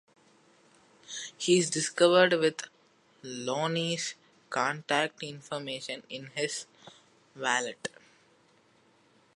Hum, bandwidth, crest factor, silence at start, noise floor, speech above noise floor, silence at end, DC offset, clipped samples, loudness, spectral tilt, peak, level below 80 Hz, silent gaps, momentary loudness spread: none; 11.5 kHz; 24 dB; 1.1 s; -65 dBFS; 36 dB; 1.5 s; under 0.1%; under 0.1%; -29 LUFS; -3 dB/octave; -8 dBFS; -82 dBFS; none; 18 LU